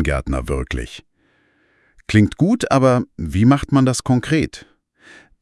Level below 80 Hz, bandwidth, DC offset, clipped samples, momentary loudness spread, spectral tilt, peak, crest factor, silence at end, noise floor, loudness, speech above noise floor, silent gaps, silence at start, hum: -34 dBFS; 12 kHz; under 0.1%; under 0.1%; 14 LU; -6.5 dB/octave; 0 dBFS; 18 dB; 0.8 s; -60 dBFS; -18 LUFS; 44 dB; none; 0 s; none